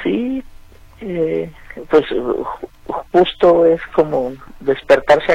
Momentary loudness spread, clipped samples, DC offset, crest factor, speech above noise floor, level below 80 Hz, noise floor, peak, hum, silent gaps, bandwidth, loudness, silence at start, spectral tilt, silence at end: 15 LU; under 0.1%; under 0.1%; 16 dB; 26 dB; -42 dBFS; -40 dBFS; 0 dBFS; none; none; 10.5 kHz; -16 LUFS; 0 s; -6.5 dB/octave; 0 s